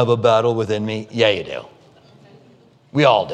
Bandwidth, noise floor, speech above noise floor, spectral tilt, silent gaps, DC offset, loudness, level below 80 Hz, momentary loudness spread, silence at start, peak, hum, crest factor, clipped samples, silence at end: 9.4 kHz; -51 dBFS; 34 dB; -6 dB/octave; none; under 0.1%; -18 LUFS; -62 dBFS; 11 LU; 0 s; 0 dBFS; none; 18 dB; under 0.1%; 0 s